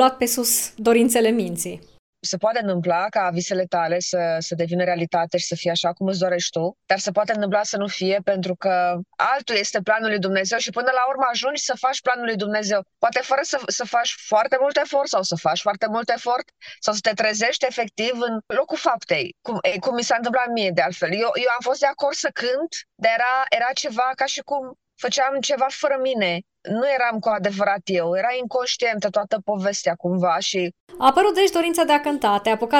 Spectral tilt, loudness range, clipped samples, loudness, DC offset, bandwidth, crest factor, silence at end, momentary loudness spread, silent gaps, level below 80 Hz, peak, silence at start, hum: -3 dB/octave; 2 LU; under 0.1%; -21 LUFS; under 0.1%; 16 kHz; 18 dB; 0 s; 6 LU; 1.99-2.13 s, 30.80-30.87 s; -66 dBFS; -2 dBFS; 0 s; none